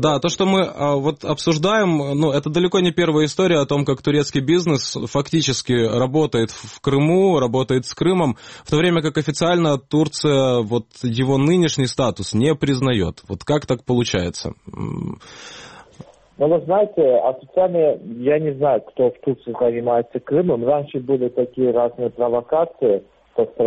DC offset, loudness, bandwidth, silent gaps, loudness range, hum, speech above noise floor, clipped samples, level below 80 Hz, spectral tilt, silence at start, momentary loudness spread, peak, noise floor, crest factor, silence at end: under 0.1%; -19 LUFS; 8.8 kHz; none; 3 LU; none; 25 dB; under 0.1%; -50 dBFS; -6 dB/octave; 0 s; 8 LU; -4 dBFS; -44 dBFS; 14 dB; 0 s